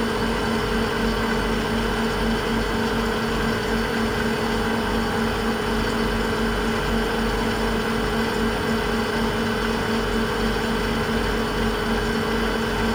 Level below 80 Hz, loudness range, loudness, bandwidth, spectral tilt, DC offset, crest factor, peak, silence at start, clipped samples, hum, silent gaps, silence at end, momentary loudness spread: -32 dBFS; 0 LU; -23 LUFS; over 20 kHz; -5 dB/octave; under 0.1%; 14 dB; -8 dBFS; 0 s; under 0.1%; 50 Hz at -35 dBFS; none; 0 s; 1 LU